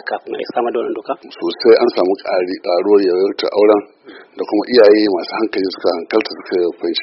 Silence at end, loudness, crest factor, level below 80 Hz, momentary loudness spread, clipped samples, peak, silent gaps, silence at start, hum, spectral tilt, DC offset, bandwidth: 0 s; -15 LUFS; 16 dB; -62 dBFS; 12 LU; under 0.1%; 0 dBFS; none; 0.05 s; none; -2 dB/octave; under 0.1%; 6 kHz